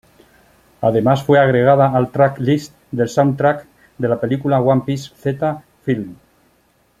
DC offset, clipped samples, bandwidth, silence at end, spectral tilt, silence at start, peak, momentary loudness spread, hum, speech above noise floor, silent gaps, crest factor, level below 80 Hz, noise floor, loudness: under 0.1%; under 0.1%; 14 kHz; 0.85 s; -7.5 dB/octave; 0.8 s; -2 dBFS; 11 LU; none; 42 dB; none; 16 dB; -54 dBFS; -58 dBFS; -17 LUFS